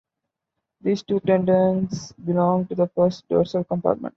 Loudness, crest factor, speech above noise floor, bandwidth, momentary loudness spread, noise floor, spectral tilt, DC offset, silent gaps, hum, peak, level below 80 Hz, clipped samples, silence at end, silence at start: -22 LUFS; 18 dB; 62 dB; 7.4 kHz; 7 LU; -83 dBFS; -8 dB/octave; under 0.1%; none; none; -4 dBFS; -58 dBFS; under 0.1%; 0.05 s; 0.85 s